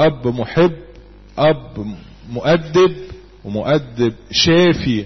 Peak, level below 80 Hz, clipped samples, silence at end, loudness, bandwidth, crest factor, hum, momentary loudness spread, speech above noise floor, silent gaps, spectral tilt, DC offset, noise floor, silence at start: 0 dBFS; -40 dBFS; under 0.1%; 0 s; -16 LUFS; 6.4 kHz; 16 dB; none; 20 LU; 24 dB; none; -5.5 dB/octave; 0.4%; -40 dBFS; 0 s